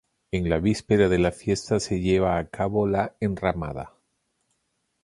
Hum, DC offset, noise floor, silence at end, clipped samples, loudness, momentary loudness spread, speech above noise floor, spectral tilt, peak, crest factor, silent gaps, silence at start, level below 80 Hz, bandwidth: none; under 0.1%; -74 dBFS; 1.15 s; under 0.1%; -24 LUFS; 10 LU; 51 dB; -6.5 dB/octave; -6 dBFS; 20 dB; none; 0.35 s; -42 dBFS; 11.5 kHz